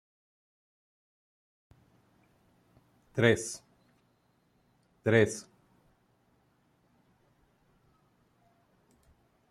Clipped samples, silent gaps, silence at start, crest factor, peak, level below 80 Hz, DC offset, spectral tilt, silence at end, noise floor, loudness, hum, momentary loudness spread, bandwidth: under 0.1%; none; 3.15 s; 28 dB; -10 dBFS; -70 dBFS; under 0.1%; -5 dB/octave; 4.1 s; -71 dBFS; -29 LUFS; none; 16 LU; 14 kHz